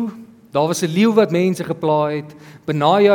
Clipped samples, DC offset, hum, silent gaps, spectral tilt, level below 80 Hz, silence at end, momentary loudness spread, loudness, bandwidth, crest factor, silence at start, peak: under 0.1%; under 0.1%; none; none; -6 dB/octave; -64 dBFS; 0 s; 13 LU; -18 LUFS; 18 kHz; 16 dB; 0 s; -2 dBFS